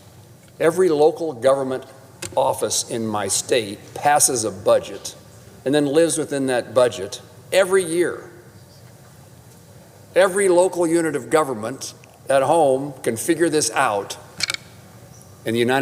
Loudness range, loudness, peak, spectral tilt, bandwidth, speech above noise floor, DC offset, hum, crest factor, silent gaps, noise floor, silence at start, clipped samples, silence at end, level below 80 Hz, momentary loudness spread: 3 LU; -20 LUFS; -4 dBFS; -3.5 dB/octave; 16.5 kHz; 27 dB; under 0.1%; none; 18 dB; none; -46 dBFS; 0.2 s; under 0.1%; 0 s; -62 dBFS; 14 LU